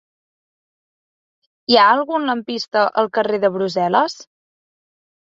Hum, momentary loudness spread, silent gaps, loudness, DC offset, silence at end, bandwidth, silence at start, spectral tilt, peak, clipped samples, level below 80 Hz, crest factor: none; 11 LU; none; -17 LUFS; under 0.1%; 1.1 s; 7.8 kHz; 1.7 s; -4.5 dB/octave; -2 dBFS; under 0.1%; -68 dBFS; 18 dB